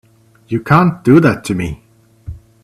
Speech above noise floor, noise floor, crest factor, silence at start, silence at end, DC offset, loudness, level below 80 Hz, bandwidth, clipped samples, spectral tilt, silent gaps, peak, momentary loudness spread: 21 dB; -33 dBFS; 14 dB; 0.5 s; 0.25 s; under 0.1%; -13 LUFS; -40 dBFS; 13.5 kHz; under 0.1%; -7.5 dB/octave; none; 0 dBFS; 24 LU